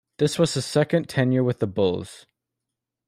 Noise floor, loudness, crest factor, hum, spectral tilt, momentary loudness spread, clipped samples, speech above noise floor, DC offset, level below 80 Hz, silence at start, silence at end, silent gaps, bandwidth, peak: -85 dBFS; -23 LUFS; 18 dB; none; -6 dB/octave; 4 LU; under 0.1%; 62 dB; under 0.1%; -62 dBFS; 0.2 s; 0.9 s; none; 14.5 kHz; -6 dBFS